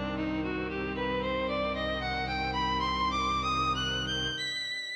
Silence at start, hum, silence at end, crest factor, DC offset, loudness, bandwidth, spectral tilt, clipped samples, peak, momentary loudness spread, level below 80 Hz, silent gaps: 0 s; none; 0 s; 12 dB; under 0.1%; -30 LUFS; 12.5 kHz; -4.5 dB/octave; under 0.1%; -18 dBFS; 4 LU; -44 dBFS; none